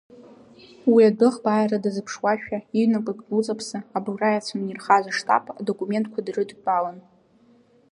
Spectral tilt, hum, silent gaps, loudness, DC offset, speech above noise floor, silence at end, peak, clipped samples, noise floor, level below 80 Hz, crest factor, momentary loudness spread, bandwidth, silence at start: -5.5 dB/octave; none; none; -23 LUFS; under 0.1%; 35 dB; 0.9 s; -4 dBFS; under 0.1%; -57 dBFS; -70 dBFS; 20 dB; 12 LU; 11 kHz; 0.2 s